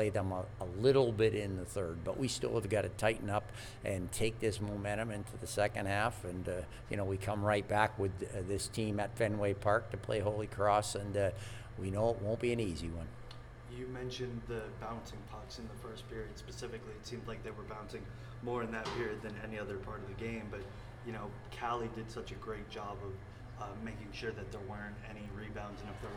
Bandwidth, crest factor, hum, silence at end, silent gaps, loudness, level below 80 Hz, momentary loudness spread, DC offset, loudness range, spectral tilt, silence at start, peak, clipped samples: 18.5 kHz; 24 dB; none; 0 s; none; -38 LUFS; -54 dBFS; 14 LU; under 0.1%; 10 LU; -5.5 dB/octave; 0 s; -14 dBFS; under 0.1%